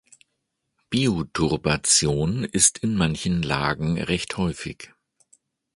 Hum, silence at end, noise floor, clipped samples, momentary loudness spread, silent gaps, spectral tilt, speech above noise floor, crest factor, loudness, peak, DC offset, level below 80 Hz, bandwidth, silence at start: none; 0.9 s; -77 dBFS; under 0.1%; 10 LU; none; -3.5 dB/octave; 54 dB; 22 dB; -22 LUFS; -2 dBFS; under 0.1%; -44 dBFS; 11.5 kHz; 0.9 s